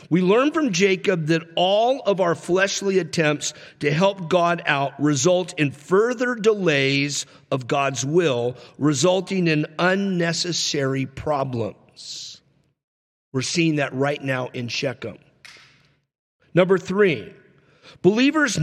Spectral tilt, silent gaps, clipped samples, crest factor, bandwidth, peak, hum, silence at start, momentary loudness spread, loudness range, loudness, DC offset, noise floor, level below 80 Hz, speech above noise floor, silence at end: -4.5 dB/octave; 12.84-13.32 s, 16.19-16.40 s; under 0.1%; 18 dB; 13.5 kHz; -4 dBFS; none; 0.1 s; 10 LU; 6 LU; -21 LUFS; under 0.1%; -58 dBFS; -62 dBFS; 38 dB; 0 s